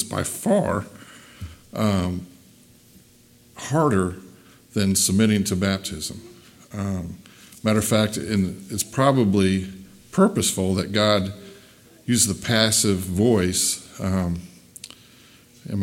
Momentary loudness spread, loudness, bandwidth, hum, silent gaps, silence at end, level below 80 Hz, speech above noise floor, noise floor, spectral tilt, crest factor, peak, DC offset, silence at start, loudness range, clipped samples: 21 LU; -22 LUFS; 17 kHz; none; none; 0 s; -52 dBFS; 32 dB; -53 dBFS; -4.5 dB/octave; 20 dB; -2 dBFS; under 0.1%; 0 s; 6 LU; under 0.1%